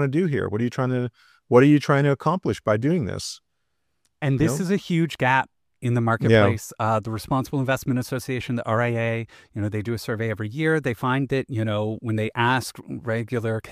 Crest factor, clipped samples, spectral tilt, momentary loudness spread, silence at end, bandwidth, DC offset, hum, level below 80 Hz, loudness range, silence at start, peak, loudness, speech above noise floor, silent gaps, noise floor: 18 dB; under 0.1%; -6.5 dB/octave; 11 LU; 0 s; 15.5 kHz; under 0.1%; none; -54 dBFS; 4 LU; 0 s; -4 dBFS; -23 LUFS; 55 dB; none; -78 dBFS